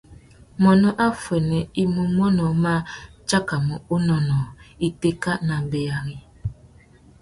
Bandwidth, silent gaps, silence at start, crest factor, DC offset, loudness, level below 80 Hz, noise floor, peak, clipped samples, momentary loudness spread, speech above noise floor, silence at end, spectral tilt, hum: 11.5 kHz; none; 0.1 s; 18 dB; under 0.1%; -22 LUFS; -46 dBFS; -50 dBFS; -4 dBFS; under 0.1%; 16 LU; 30 dB; 0.7 s; -6.5 dB/octave; none